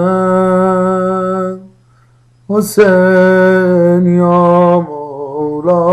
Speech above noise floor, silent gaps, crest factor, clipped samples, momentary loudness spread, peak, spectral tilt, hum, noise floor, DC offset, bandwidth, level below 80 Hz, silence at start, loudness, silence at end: 40 dB; none; 10 dB; 0.1%; 11 LU; 0 dBFS; -7.5 dB/octave; none; -48 dBFS; under 0.1%; 13 kHz; -48 dBFS; 0 s; -10 LUFS; 0 s